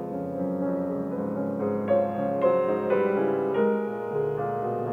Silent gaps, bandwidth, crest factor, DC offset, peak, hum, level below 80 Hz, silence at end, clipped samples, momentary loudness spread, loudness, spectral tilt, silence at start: none; 4.3 kHz; 14 dB; under 0.1%; -12 dBFS; none; -66 dBFS; 0 s; under 0.1%; 6 LU; -27 LUFS; -9.5 dB/octave; 0 s